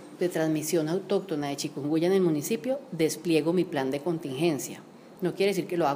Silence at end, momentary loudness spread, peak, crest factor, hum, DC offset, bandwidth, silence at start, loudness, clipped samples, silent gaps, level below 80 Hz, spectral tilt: 0 s; 7 LU; -12 dBFS; 16 dB; none; under 0.1%; 15.5 kHz; 0 s; -28 LUFS; under 0.1%; none; -76 dBFS; -5.5 dB/octave